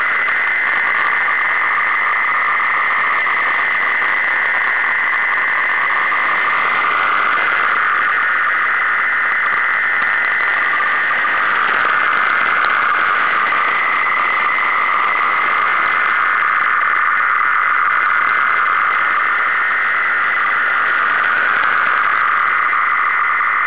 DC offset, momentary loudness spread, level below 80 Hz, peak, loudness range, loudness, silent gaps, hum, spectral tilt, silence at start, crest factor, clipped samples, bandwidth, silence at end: 1%; 1 LU; -62 dBFS; -6 dBFS; 0 LU; -14 LUFS; none; none; -4 dB/octave; 0 s; 10 dB; under 0.1%; 4 kHz; 0 s